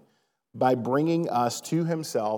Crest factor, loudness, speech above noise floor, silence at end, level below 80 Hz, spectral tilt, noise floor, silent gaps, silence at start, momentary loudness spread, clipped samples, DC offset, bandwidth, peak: 18 dB; -26 LUFS; 44 dB; 0 s; -86 dBFS; -6 dB/octave; -70 dBFS; none; 0.55 s; 4 LU; under 0.1%; under 0.1%; 18.5 kHz; -8 dBFS